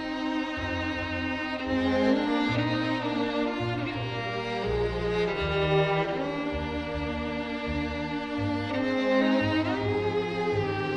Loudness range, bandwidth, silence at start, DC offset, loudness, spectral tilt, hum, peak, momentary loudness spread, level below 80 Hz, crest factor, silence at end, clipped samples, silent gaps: 1 LU; 9.8 kHz; 0 s; under 0.1%; -28 LUFS; -7 dB/octave; none; -12 dBFS; 7 LU; -44 dBFS; 16 dB; 0 s; under 0.1%; none